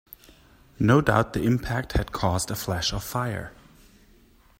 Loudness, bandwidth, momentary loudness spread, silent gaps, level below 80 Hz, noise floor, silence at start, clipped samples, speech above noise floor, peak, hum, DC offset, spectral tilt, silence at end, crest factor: -25 LUFS; 16 kHz; 9 LU; none; -40 dBFS; -56 dBFS; 0.8 s; under 0.1%; 32 dB; -4 dBFS; none; under 0.1%; -5.5 dB/octave; 1.1 s; 22 dB